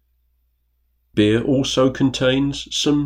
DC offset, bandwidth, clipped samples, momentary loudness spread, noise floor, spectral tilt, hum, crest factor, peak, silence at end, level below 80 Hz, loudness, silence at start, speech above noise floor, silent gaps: under 0.1%; 14.5 kHz; under 0.1%; 4 LU; -66 dBFS; -5 dB/octave; none; 16 dB; -4 dBFS; 0 s; -44 dBFS; -19 LUFS; 1.15 s; 48 dB; none